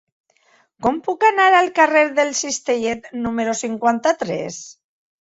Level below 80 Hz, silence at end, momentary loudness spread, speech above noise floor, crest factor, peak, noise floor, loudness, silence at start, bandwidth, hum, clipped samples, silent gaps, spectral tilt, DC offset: -56 dBFS; 0.5 s; 11 LU; 40 dB; 18 dB; -2 dBFS; -58 dBFS; -18 LUFS; 0.8 s; 8 kHz; none; under 0.1%; none; -3 dB/octave; under 0.1%